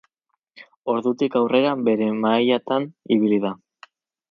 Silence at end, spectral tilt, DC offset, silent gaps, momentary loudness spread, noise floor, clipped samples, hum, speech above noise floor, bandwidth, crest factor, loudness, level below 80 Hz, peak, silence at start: 0.75 s; -7.5 dB/octave; under 0.1%; 0.76-0.83 s; 7 LU; -76 dBFS; under 0.1%; none; 56 dB; 6.2 kHz; 18 dB; -21 LUFS; -70 dBFS; -4 dBFS; 0.55 s